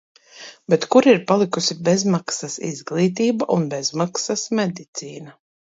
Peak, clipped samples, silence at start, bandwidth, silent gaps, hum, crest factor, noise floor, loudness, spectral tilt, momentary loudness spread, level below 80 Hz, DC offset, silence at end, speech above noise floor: -2 dBFS; under 0.1%; 0.35 s; 8 kHz; 4.88-4.93 s; none; 18 dB; -43 dBFS; -20 LUFS; -4.5 dB/octave; 17 LU; -68 dBFS; under 0.1%; 0.45 s; 23 dB